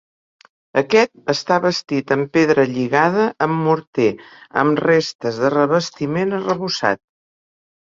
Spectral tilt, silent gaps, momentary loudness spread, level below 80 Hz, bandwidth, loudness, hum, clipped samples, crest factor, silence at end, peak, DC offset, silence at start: -5.5 dB/octave; 3.87-3.93 s, 5.15-5.19 s; 7 LU; -60 dBFS; 7.6 kHz; -18 LUFS; none; under 0.1%; 18 dB; 0.95 s; -2 dBFS; under 0.1%; 0.75 s